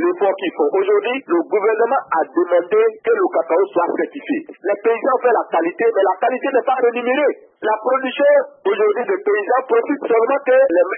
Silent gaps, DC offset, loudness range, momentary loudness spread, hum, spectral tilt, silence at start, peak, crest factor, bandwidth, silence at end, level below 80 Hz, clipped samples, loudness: none; under 0.1%; 1 LU; 6 LU; none; -9 dB/octave; 0 s; -4 dBFS; 12 dB; 3.5 kHz; 0 s; -78 dBFS; under 0.1%; -17 LUFS